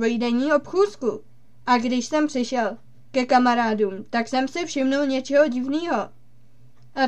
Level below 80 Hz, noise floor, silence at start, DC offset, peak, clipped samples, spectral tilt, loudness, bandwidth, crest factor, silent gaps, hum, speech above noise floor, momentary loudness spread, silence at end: -66 dBFS; -56 dBFS; 0 s; 0.7%; -4 dBFS; under 0.1%; -4 dB/octave; -22 LUFS; 9.2 kHz; 18 dB; none; none; 34 dB; 9 LU; 0 s